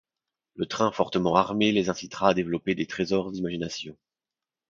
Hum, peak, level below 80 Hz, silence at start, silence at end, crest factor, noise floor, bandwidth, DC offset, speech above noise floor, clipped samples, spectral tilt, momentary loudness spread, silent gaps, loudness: none; -4 dBFS; -58 dBFS; 0.55 s; 0.75 s; 24 dB; under -90 dBFS; 7.6 kHz; under 0.1%; over 64 dB; under 0.1%; -5.5 dB/octave; 10 LU; none; -26 LUFS